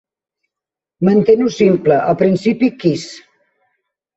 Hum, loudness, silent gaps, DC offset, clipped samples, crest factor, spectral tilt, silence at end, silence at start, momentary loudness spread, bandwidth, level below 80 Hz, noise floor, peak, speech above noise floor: none; -14 LUFS; none; under 0.1%; under 0.1%; 14 dB; -7 dB/octave; 1 s; 1 s; 7 LU; 8 kHz; -56 dBFS; -86 dBFS; -2 dBFS; 73 dB